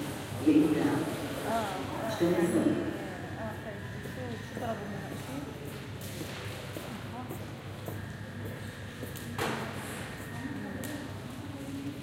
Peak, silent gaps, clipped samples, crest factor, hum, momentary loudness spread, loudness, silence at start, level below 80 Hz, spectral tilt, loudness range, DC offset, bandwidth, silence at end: -12 dBFS; none; under 0.1%; 22 dB; none; 13 LU; -34 LUFS; 0 s; -56 dBFS; -6 dB/octave; 10 LU; under 0.1%; 16 kHz; 0 s